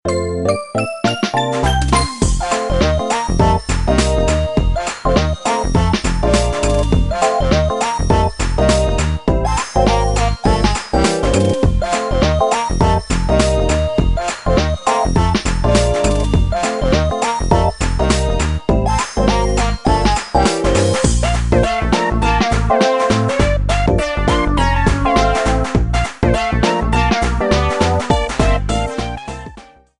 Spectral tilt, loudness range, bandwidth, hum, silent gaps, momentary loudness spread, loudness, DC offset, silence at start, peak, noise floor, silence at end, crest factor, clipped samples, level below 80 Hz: -5.5 dB/octave; 1 LU; 11.5 kHz; none; none; 4 LU; -16 LUFS; under 0.1%; 0.05 s; 0 dBFS; -40 dBFS; 0.4 s; 14 dB; under 0.1%; -20 dBFS